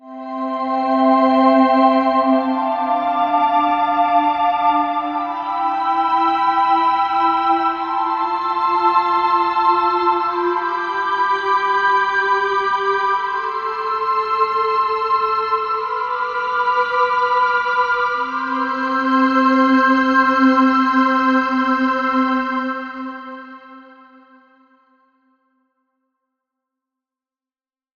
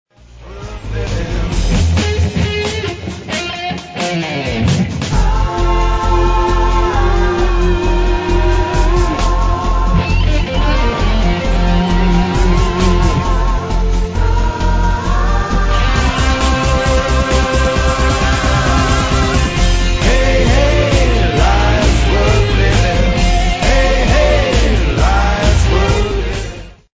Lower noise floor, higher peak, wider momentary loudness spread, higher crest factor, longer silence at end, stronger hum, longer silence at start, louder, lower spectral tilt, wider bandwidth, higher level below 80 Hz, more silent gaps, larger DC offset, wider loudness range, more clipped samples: first, under -90 dBFS vs -34 dBFS; about the same, -2 dBFS vs 0 dBFS; about the same, 8 LU vs 6 LU; about the same, 16 dB vs 12 dB; first, 4.15 s vs 0.2 s; neither; second, 0.05 s vs 0.35 s; second, -17 LUFS vs -14 LUFS; about the same, -4.5 dB/octave vs -5.5 dB/octave; second, 6.8 kHz vs 8 kHz; second, -58 dBFS vs -14 dBFS; neither; neither; about the same, 4 LU vs 5 LU; neither